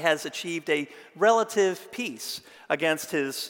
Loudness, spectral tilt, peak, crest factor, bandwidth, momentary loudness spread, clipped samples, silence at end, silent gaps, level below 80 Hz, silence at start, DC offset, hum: -27 LUFS; -3 dB/octave; -8 dBFS; 20 dB; 17 kHz; 12 LU; under 0.1%; 0 s; none; -80 dBFS; 0 s; under 0.1%; none